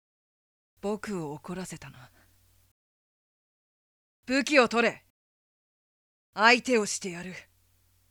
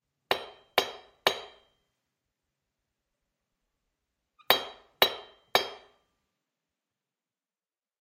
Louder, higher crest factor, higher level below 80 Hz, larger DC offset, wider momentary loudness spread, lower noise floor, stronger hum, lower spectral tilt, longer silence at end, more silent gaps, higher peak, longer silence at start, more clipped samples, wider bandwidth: first, -26 LUFS vs -29 LUFS; second, 24 dB vs 32 dB; first, -68 dBFS vs -74 dBFS; neither; first, 21 LU vs 13 LU; second, -67 dBFS vs under -90 dBFS; neither; first, -3 dB/octave vs -1 dB/octave; second, 0.7 s vs 2.2 s; first, 2.71-4.23 s, 5.10-6.33 s vs none; second, -6 dBFS vs -2 dBFS; first, 0.85 s vs 0.3 s; neither; first, 18.5 kHz vs 15.5 kHz